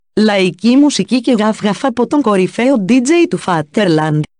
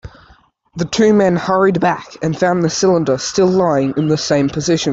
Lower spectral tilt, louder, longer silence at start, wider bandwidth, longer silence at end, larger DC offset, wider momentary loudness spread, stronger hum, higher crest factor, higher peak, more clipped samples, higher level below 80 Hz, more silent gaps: about the same, -5.5 dB/octave vs -5.5 dB/octave; about the same, -13 LUFS vs -15 LUFS; about the same, 0.15 s vs 0.05 s; first, 10.5 kHz vs 8 kHz; first, 0.15 s vs 0 s; neither; about the same, 5 LU vs 7 LU; neither; about the same, 10 dB vs 12 dB; about the same, -2 dBFS vs -2 dBFS; neither; second, -56 dBFS vs -48 dBFS; neither